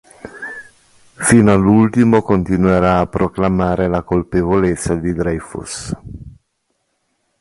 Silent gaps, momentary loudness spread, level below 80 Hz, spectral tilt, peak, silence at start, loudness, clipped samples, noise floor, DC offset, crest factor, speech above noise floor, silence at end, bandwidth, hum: none; 18 LU; -36 dBFS; -6.5 dB/octave; 0 dBFS; 0.25 s; -15 LUFS; under 0.1%; -68 dBFS; under 0.1%; 16 dB; 54 dB; 1.1 s; 11.5 kHz; none